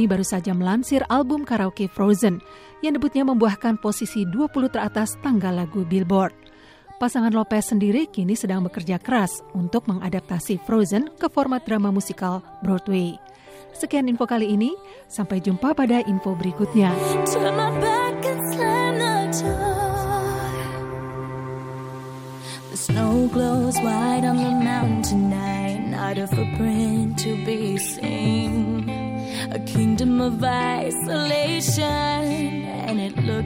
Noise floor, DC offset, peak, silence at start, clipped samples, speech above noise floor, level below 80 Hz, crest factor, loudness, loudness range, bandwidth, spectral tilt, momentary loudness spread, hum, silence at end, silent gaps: -47 dBFS; under 0.1%; -6 dBFS; 0 s; under 0.1%; 25 dB; -46 dBFS; 16 dB; -22 LUFS; 3 LU; 16.5 kHz; -5.5 dB/octave; 8 LU; none; 0 s; none